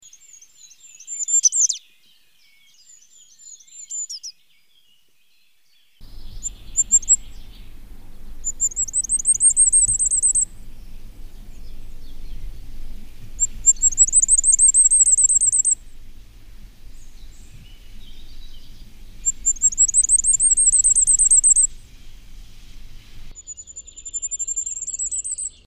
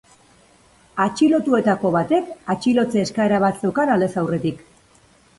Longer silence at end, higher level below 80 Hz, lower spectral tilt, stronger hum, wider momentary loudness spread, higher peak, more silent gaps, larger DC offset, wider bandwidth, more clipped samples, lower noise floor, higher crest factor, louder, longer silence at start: second, 0.2 s vs 0.8 s; first, -38 dBFS vs -56 dBFS; second, 1 dB/octave vs -6.5 dB/octave; neither; first, 19 LU vs 7 LU; about the same, -4 dBFS vs -4 dBFS; neither; first, 0.2% vs under 0.1%; first, 15.5 kHz vs 11.5 kHz; neither; first, -63 dBFS vs -54 dBFS; about the same, 18 dB vs 16 dB; first, -15 LUFS vs -19 LUFS; second, 0.65 s vs 0.95 s